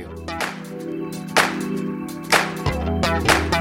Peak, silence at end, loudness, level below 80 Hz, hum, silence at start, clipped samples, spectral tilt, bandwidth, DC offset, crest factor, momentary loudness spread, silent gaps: -2 dBFS; 0 s; -22 LUFS; -38 dBFS; none; 0 s; under 0.1%; -4 dB/octave; 17 kHz; under 0.1%; 20 dB; 12 LU; none